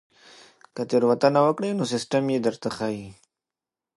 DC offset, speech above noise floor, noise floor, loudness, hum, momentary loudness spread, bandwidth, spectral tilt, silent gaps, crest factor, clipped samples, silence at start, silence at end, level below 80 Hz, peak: under 0.1%; 66 dB; -89 dBFS; -24 LUFS; none; 15 LU; 11.5 kHz; -6 dB/octave; none; 20 dB; under 0.1%; 0.75 s; 0.85 s; -66 dBFS; -6 dBFS